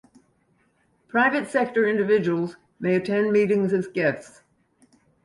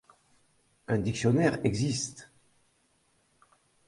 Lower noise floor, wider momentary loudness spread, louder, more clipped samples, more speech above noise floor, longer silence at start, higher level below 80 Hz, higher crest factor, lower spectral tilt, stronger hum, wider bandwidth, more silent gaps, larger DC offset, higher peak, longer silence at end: second, -65 dBFS vs -70 dBFS; second, 7 LU vs 17 LU; first, -23 LUFS vs -29 LUFS; neither; about the same, 43 dB vs 42 dB; first, 1.15 s vs 0.9 s; second, -68 dBFS vs -58 dBFS; second, 16 dB vs 22 dB; first, -7 dB/octave vs -5.5 dB/octave; neither; about the same, 11.5 kHz vs 11.5 kHz; neither; neither; about the same, -8 dBFS vs -10 dBFS; second, 0.95 s vs 1.65 s